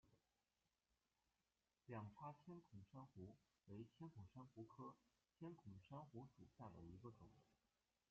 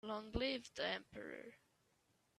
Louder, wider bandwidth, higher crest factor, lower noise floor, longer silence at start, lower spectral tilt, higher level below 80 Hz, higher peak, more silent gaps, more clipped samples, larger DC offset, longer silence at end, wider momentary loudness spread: second, -62 LUFS vs -44 LUFS; second, 7 kHz vs 13 kHz; about the same, 20 dB vs 22 dB; first, under -90 dBFS vs -79 dBFS; about the same, 0.05 s vs 0.05 s; first, -8 dB/octave vs -4.5 dB/octave; second, -84 dBFS vs -62 dBFS; second, -44 dBFS vs -24 dBFS; neither; neither; neither; second, 0.55 s vs 0.8 s; second, 6 LU vs 13 LU